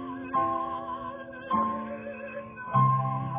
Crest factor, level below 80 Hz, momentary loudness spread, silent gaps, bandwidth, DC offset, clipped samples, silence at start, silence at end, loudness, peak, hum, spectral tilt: 18 dB; -60 dBFS; 14 LU; none; 3.8 kHz; under 0.1%; under 0.1%; 0 s; 0 s; -30 LUFS; -12 dBFS; none; -7 dB/octave